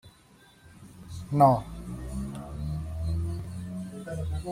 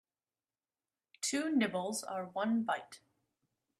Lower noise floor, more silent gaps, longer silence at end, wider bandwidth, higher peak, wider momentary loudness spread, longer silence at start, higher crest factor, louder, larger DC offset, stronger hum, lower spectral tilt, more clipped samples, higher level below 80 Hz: second, -57 dBFS vs under -90 dBFS; neither; second, 0 s vs 0.8 s; first, 16 kHz vs 14 kHz; first, -8 dBFS vs -18 dBFS; first, 20 LU vs 8 LU; second, 0.05 s vs 1.2 s; about the same, 22 dB vs 20 dB; first, -30 LUFS vs -35 LUFS; neither; neither; first, -8 dB/octave vs -3.5 dB/octave; neither; first, -44 dBFS vs -82 dBFS